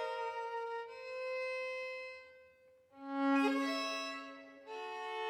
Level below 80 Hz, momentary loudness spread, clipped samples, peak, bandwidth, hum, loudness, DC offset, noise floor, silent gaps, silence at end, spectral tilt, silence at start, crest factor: -88 dBFS; 18 LU; under 0.1%; -22 dBFS; 14 kHz; none; -39 LUFS; under 0.1%; -65 dBFS; none; 0 s; -2.5 dB/octave; 0 s; 18 dB